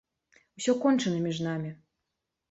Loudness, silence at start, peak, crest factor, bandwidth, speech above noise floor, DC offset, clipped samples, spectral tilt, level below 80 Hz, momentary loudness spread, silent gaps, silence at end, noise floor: -29 LUFS; 0.6 s; -14 dBFS; 16 dB; 8.2 kHz; 57 dB; under 0.1%; under 0.1%; -5.5 dB/octave; -72 dBFS; 10 LU; none; 0.75 s; -84 dBFS